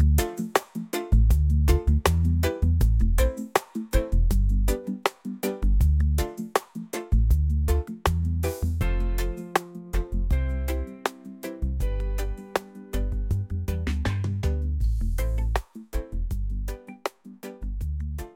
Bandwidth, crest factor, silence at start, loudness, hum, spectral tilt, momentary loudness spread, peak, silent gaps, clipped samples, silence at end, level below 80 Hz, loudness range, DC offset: 17 kHz; 18 dB; 0 s; -27 LUFS; none; -6 dB/octave; 11 LU; -6 dBFS; none; under 0.1%; 0.05 s; -26 dBFS; 7 LU; under 0.1%